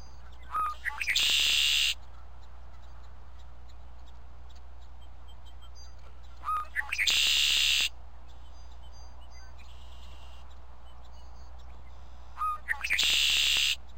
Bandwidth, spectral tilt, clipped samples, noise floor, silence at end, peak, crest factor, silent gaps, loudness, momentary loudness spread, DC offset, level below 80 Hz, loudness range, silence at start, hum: 16 kHz; 1 dB/octave; under 0.1%; -50 dBFS; 0 s; -10 dBFS; 22 dB; none; -26 LUFS; 17 LU; 1%; -50 dBFS; 23 LU; 0 s; none